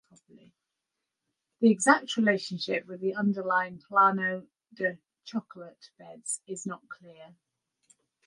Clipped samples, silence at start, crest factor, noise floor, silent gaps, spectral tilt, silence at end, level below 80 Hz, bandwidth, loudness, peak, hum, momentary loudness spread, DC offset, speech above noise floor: under 0.1%; 1.6 s; 24 dB; -86 dBFS; none; -4 dB/octave; 1 s; -82 dBFS; 11.5 kHz; -28 LUFS; -6 dBFS; none; 23 LU; under 0.1%; 57 dB